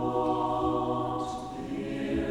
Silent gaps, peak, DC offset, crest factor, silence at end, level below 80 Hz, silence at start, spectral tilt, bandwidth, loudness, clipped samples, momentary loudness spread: none; -14 dBFS; under 0.1%; 14 dB; 0 s; -48 dBFS; 0 s; -7 dB/octave; 12 kHz; -31 LUFS; under 0.1%; 7 LU